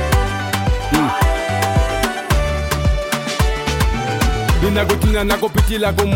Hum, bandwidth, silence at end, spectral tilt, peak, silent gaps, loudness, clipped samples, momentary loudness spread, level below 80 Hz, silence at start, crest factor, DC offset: none; 17 kHz; 0 s; -5 dB/octave; -2 dBFS; none; -17 LUFS; under 0.1%; 3 LU; -20 dBFS; 0 s; 16 dB; under 0.1%